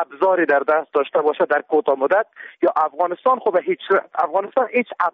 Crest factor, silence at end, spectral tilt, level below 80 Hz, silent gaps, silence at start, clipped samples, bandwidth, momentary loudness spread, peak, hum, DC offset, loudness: 14 dB; 0.05 s; -2.5 dB/octave; -72 dBFS; none; 0 s; under 0.1%; 5 kHz; 4 LU; -6 dBFS; none; under 0.1%; -19 LUFS